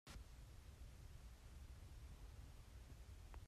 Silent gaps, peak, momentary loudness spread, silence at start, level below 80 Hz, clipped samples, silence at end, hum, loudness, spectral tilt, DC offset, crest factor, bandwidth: none; -44 dBFS; 2 LU; 0.05 s; -60 dBFS; under 0.1%; 0 s; none; -62 LUFS; -5 dB/octave; under 0.1%; 16 dB; 14.5 kHz